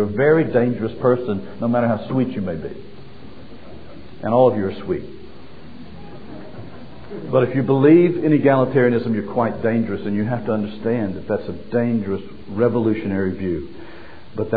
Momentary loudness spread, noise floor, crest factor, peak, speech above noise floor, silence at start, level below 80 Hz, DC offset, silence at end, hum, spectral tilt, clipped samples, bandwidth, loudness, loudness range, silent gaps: 23 LU; -41 dBFS; 18 dB; -2 dBFS; 22 dB; 0 s; -50 dBFS; 2%; 0 s; none; -11.5 dB/octave; under 0.1%; 5 kHz; -19 LUFS; 7 LU; none